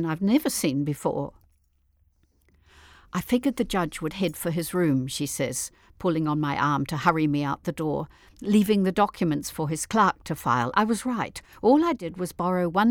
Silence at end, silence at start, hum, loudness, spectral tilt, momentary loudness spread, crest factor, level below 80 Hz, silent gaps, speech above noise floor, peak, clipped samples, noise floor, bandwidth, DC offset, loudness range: 0 s; 0 s; none; -25 LUFS; -5.5 dB/octave; 9 LU; 20 dB; -54 dBFS; none; 41 dB; -6 dBFS; under 0.1%; -66 dBFS; 19.5 kHz; under 0.1%; 6 LU